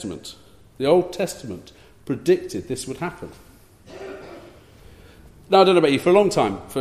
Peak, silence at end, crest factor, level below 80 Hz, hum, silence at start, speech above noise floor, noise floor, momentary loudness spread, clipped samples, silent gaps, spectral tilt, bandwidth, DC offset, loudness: -2 dBFS; 0 s; 20 dB; -54 dBFS; none; 0 s; 27 dB; -47 dBFS; 23 LU; under 0.1%; none; -5.5 dB/octave; 15 kHz; under 0.1%; -20 LUFS